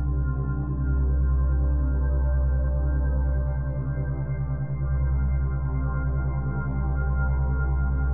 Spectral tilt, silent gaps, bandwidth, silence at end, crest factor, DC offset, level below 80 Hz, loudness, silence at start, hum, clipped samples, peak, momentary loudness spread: -13 dB/octave; none; 2.2 kHz; 0 s; 10 dB; 1%; -24 dBFS; -26 LUFS; 0 s; none; under 0.1%; -14 dBFS; 4 LU